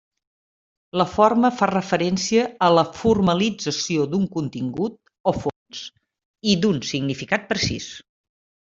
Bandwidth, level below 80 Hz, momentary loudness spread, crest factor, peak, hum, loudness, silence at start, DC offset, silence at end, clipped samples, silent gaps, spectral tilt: 7.8 kHz; -52 dBFS; 12 LU; 20 dB; -2 dBFS; none; -21 LUFS; 0.95 s; under 0.1%; 0.7 s; under 0.1%; 5.20-5.24 s, 5.56-5.66 s, 6.25-6.34 s; -5 dB/octave